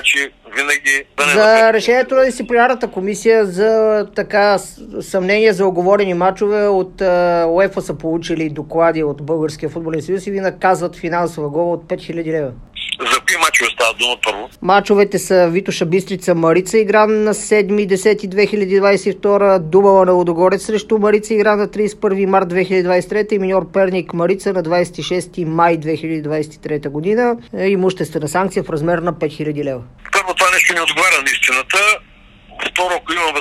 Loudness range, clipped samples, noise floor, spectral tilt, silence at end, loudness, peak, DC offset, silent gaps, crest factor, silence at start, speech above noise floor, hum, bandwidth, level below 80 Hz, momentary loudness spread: 5 LU; under 0.1%; -42 dBFS; -4 dB/octave; 0 s; -15 LUFS; 0 dBFS; under 0.1%; none; 14 dB; 0 s; 27 dB; none; 14.5 kHz; -46 dBFS; 9 LU